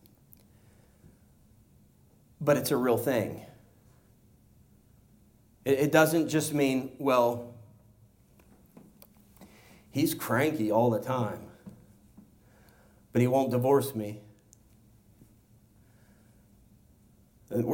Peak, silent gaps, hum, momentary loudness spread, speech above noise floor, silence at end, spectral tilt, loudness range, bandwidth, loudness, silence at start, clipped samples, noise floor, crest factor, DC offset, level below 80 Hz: -8 dBFS; none; none; 15 LU; 35 dB; 0 s; -6 dB/octave; 6 LU; 17 kHz; -28 LUFS; 2.4 s; under 0.1%; -61 dBFS; 22 dB; under 0.1%; -66 dBFS